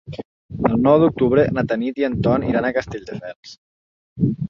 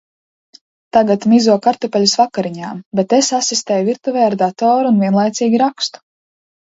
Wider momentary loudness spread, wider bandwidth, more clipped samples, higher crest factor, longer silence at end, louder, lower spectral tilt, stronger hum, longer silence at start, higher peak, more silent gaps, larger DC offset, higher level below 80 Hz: first, 20 LU vs 9 LU; second, 7.2 kHz vs 8 kHz; neither; about the same, 18 dB vs 14 dB; second, 0 s vs 0.75 s; second, -18 LUFS vs -15 LUFS; first, -8.5 dB/octave vs -4.5 dB/octave; neither; second, 0.05 s vs 0.95 s; about the same, -2 dBFS vs 0 dBFS; first, 0.25-0.49 s, 3.36-3.43 s, 3.58-4.16 s vs 2.86-2.91 s; neither; first, -44 dBFS vs -62 dBFS